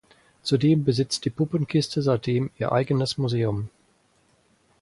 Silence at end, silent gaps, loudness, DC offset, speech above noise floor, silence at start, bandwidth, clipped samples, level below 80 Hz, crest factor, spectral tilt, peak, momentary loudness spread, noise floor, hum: 1.15 s; none; -24 LUFS; under 0.1%; 40 dB; 0.45 s; 11.5 kHz; under 0.1%; -56 dBFS; 16 dB; -6.5 dB/octave; -8 dBFS; 6 LU; -64 dBFS; none